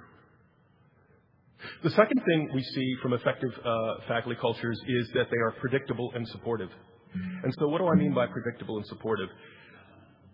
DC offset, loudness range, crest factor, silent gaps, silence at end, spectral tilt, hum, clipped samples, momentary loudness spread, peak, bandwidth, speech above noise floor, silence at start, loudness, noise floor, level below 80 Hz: under 0.1%; 3 LU; 24 dB; none; 0.55 s; -9.5 dB/octave; none; under 0.1%; 12 LU; -6 dBFS; 5.6 kHz; 34 dB; 0 s; -29 LUFS; -63 dBFS; -68 dBFS